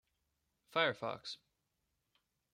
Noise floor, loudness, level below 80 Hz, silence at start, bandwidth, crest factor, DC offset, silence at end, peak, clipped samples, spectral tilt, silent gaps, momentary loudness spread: -85 dBFS; -38 LUFS; -84 dBFS; 0.7 s; 16 kHz; 26 dB; under 0.1%; 1.2 s; -18 dBFS; under 0.1%; -4 dB/octave; none; 14 LU